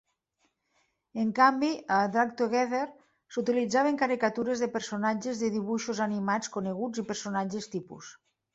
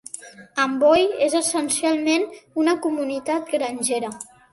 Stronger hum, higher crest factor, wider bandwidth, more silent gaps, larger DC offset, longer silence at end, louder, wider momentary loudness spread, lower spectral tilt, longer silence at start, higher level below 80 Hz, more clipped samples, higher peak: neither; about the same, 20 dB vs 18 dB; second, 8 kHz vs 12 kHz; neither; neither; first, 0.45 s vs 0.3 s; second, -29 LUFS vs -21 LUFS; about the same, 13 LU vs 13 LU; first, -4.5 dB/octave vs -2 dB/octave; first, 1.15 s vs 0.15 s; second, -72 dBFS vs -62 dBFS; neither; second, -10 dBFS vs -4 dBFS